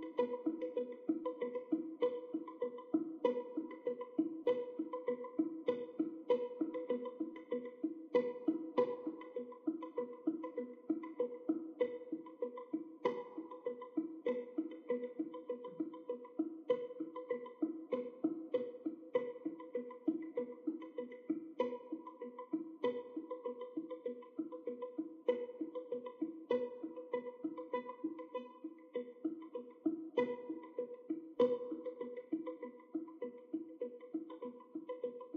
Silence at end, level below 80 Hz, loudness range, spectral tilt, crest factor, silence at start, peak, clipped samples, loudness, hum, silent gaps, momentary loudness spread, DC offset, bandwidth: 0 s; under -90 dBFS; 4 LU; -5 dB/octave; 22 dB; 0 s; -20 dBFS; under 0.1%; -42 LUFS; none; none; 9 LU; under 0.1%; 4.9 kHz